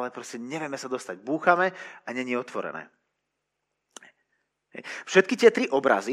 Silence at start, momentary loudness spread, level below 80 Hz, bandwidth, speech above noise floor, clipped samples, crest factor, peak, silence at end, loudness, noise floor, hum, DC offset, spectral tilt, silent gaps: 0 s; 18 LU; -90 dBFS; 12.5 kHz; 55 dB; under 0.1%; 24 dB; -4 dBFS; 0 s; -25 LUFS; -81 dBFS; 50 Hz at -80 dBFS; under 0.1%; -4.5 dB/octave; none